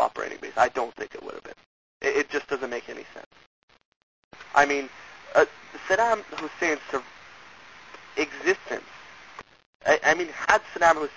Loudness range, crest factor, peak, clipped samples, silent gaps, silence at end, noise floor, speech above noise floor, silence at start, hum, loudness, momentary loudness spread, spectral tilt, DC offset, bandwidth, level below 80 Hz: 6 LU; 26 dB; -2 dBFS; under 0.1%; 1.66-2.00 s, 3.26-3.31 s, 3.46-3.68 s, 3.85-4.31 s, 9.66-9.80 s; 0 s; -48 dBFS; 23 dB; 0 s; none; -25 LUFS; 24 LU; -2.5 dB/octave; 0.1%; 8 kHz; -62 dBFS